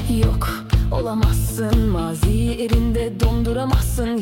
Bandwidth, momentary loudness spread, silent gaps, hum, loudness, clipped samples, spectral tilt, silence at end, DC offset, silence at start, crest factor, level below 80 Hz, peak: 17 kHz; 2 LU; none; none; -20 LUFS; under 0.1%; -6.5 dB/octave; 0 s; under 0.1%; 0 s; 14 dB; -22 dBFS; -4 dBFS